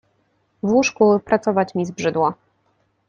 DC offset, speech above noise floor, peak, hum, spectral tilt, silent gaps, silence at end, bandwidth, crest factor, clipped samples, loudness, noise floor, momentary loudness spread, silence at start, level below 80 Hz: under 0.1%; 47 dB; -2 dBFS; none; -5.5 dB/octave; none; 0.75 s; 7.6 kHz; 18 dB; under 0.1%; -19 LUFS; -65 dBFS; 7 LU; 0.65 s; -60 dBFS